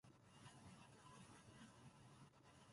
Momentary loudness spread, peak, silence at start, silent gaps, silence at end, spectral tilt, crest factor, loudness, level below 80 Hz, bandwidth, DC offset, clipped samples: 4 LU; -50 dBFS; 0.05 s; none; 0 s; -4.5 dB/octave; 14 dB; -65 LUFS; -82 dBFS; 11.5 kHz; under 0.1%; under 0.1%